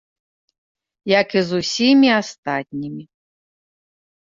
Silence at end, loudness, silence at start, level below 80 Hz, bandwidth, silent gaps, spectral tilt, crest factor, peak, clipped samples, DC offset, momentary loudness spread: 1.2 s; -17 LUFS; 1.05 s; -62 dBFS; 7.6 kHz; 2.38-2.43 s; -4.5 dB/octave; 18 dB; -2 dBFS; under 0.1%; under 0.1%; 18 LU